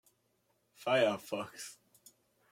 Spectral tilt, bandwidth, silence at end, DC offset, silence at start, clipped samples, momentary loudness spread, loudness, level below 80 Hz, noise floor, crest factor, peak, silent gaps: -4 dB/octave; 16.5 kHz; 0.8 s; under 0.1%; 0.8 s; under 0.1%; 17 LU; -34 LUFS; -84 dBFS; -77 dBFS; 22 dB; -16 dBFS; none